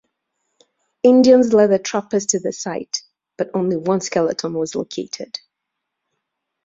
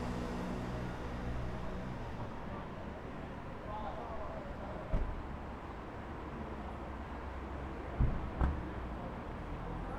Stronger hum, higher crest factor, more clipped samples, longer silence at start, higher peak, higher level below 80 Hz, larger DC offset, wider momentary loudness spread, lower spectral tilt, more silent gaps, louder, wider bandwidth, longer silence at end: neither; about the same, 18 dB vs 22 dB; neither; first, 1.05 s vs 0 s; first, -2 dBFS vs -18 dBFS; second, -62 dBFS vs -44 dBFS; neither; first, 16 LU vs 8 LU; second, -4.5 dB/octave vs -7.5 dB/octave; neither; first, -18 LUFS vs -42 LUFS; second, 7.8 kHz vs 11 kHz; first, 1.3 s vs 0 s